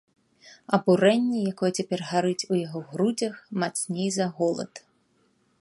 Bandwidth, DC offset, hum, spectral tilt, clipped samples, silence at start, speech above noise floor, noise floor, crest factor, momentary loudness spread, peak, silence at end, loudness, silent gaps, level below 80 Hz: 11.5 kHz; under 0.1%; none; -5 dB/octave; under 0.1%; 0.45 s; 42 dB; -67 dBFS; 22 dB; 10 LU; -6 dBFS; 0.85 s; -26 LUFS; none; -72 dBFS